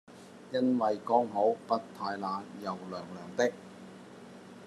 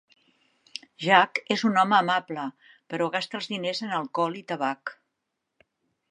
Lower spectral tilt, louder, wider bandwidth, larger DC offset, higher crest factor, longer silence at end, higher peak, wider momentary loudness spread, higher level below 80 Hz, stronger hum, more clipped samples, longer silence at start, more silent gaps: about the same, -5.5 dB/octave vs -4.5 dB/octave; second, -32 LUFS vs -25 LUFS; first, 12.5 kHz vs 10.5 kHz; neither; about the same, 22 dB vs 26 dB; second, 0 s vs 1.2 s; second, -12 dBFS vs -2 dBFS; first, 22 LU vs 17 LU; about the same, -84 dBFS vs -80 dBFS; neither; neither; second, 0.1 s vs 1 s; neither